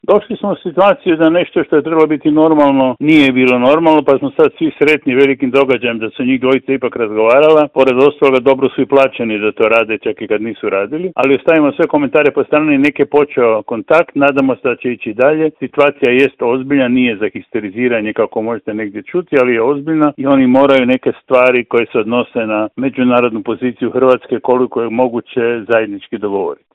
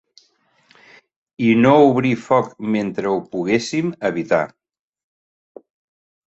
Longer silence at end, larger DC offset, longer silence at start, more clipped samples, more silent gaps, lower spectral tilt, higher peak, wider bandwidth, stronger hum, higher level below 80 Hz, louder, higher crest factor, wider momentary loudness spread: second, 0.2 s vs 1.8 s; neither; second, 0.1 s vs 1.4 s; first, 0.1% vs under 0.1%; neither; about the same, -7.5 dB/octave vs -6.5 dB/octave; about the same, 0 dBFS vs 0 dBFS; about the same, 8.2 kHz vs 8.2 kHz; neither; first, -54 dBFS vs -60 dBFS; first, -12 LUFS vs -18 LUFS; second, 12 dB vs 20 dB; about the same, 8 LU vs 10 LU